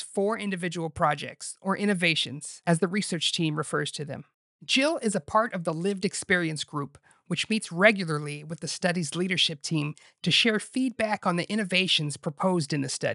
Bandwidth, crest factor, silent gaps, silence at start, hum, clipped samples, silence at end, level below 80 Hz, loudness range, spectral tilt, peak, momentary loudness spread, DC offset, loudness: 11.5 kHz; 22 dB; 4.34-4.59 s; 0 s; none; under 0.1%; 0 s; -66 dBFS; 2 LU; -4 dB/octave; -4 dBFS; 11 LU; under 0.1%; -27 LUFS